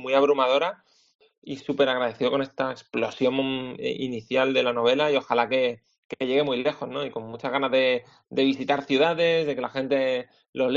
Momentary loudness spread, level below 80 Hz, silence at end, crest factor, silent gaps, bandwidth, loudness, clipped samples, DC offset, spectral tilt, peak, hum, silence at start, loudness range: 10 LU; -66 dBFS; 0 s; 20 dB; 1.15-1.19 s, 1.38-1.42 s, 5.98-6.09 s, 10.49-10.53 s; 7.4 kHz; -25 LUFS; under 0.1%; under 0.1%; -2.5 dB/octave; -6 dBFS; none; 0 s; 2 LU